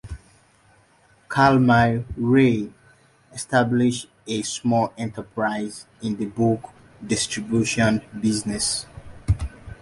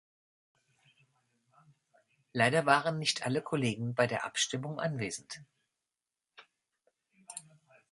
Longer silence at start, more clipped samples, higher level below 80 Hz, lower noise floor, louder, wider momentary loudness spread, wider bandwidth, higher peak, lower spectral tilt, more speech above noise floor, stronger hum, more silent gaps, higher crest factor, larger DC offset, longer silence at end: second, 0.05 s vs 2.35 s; neither; first, -42 dBFS vs -74 dBFS; second, -57 dBFS vs under -90 dBFS; first, -22 LUFS vs -31 LUFS; about the same, 17 LU vs 19 LU; about the same, 11.5 kHz vs 11.5 kHz; first, -4 dBFS vs -10 dBFS; about the same, -5 dB/octave vs -4 dB/octave; second, 36 dB vs over 58 dB; neither; neither; second, 18 dB vs 26 dB; neither; second, 0.05 s vs 0.5 s